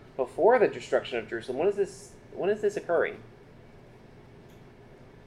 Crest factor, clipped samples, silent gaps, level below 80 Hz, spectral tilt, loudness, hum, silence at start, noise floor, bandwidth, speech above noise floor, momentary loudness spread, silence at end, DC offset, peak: 20 dB; under 0.1%; none; -60 dBFS; -5.5 dB/octave; -28 LUFS; none; 0.2 s; -51 dBFS; 11.5 kHz; 24 dB; 12 LU; 0.3 s; under 0.1%; -10 dBFS